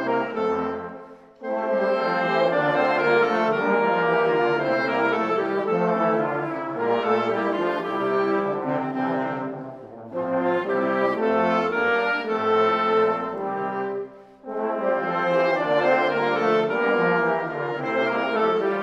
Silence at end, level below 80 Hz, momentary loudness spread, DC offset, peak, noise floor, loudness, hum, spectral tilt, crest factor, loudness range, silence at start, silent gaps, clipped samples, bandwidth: 0 s; -68 dBFS; 9 LU; under 0.1%; -8 dBFS; -43 dBFS; -23 LUFS; none; -7 dB/octave; 16 dB; 4 LU; 0 s; none; under 0.1%; 7.8 kHz